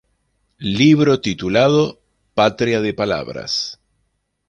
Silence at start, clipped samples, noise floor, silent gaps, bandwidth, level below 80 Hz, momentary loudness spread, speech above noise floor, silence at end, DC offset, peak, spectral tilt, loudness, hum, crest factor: 0.6 s; under 0.1%; -69 dBFS; none; 8.8 kHz; -50 dBFS; 11 LU; 53 dB; 0.75 s; under 0.1%; -2 dBFS; -5.5 dB/octave; -17 LUFS; none; 16 dB